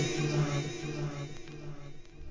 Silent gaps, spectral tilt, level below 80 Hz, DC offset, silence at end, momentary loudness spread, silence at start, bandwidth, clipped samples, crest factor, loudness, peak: none; -5.5 dB/octave; -52 dBFS; 0.2%; 0 s; 19 LU; 0 s; 7.6 kHz; under 0.1%; 16 dB; -35 LUFS; -18 dBFS